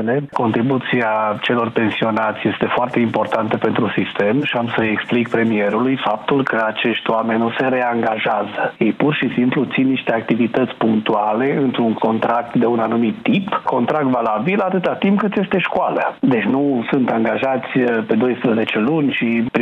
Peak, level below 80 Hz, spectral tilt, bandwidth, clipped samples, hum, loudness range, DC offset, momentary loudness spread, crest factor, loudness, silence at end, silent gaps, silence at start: -2 dBFS; -60 dBFS; -8 dB/octave; 5.8 kHz; under 0.1%; none; 1 LU; under 0.1%; 2 LU; 14 dB; -18 LUFS; 0 s; none; 0 s